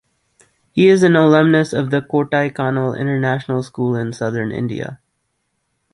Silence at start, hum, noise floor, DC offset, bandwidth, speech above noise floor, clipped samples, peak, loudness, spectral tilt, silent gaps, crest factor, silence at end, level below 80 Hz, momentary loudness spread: 0.75 s; none; -70 dBFS; under 0.1%; 11.5 kHz; 54 dB; under 0.1%; -2 dBFS; -16 LUFS; -7 dB/octave; none; 16 dB; 1 s; -56 dBFS; 12 LU